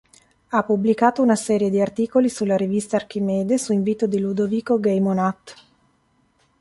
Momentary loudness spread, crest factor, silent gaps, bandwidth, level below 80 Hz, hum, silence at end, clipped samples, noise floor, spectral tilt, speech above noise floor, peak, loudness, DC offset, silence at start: 6 LU; 18 dB; none; 11.5 kHz; -62 dBFS; none; 1.05 s; under 0.1%; -63 dBFS; -6.5 dB/octave; 43 dB; -4 dBFS; -21 LUFS; under 0.1%; 0.5 s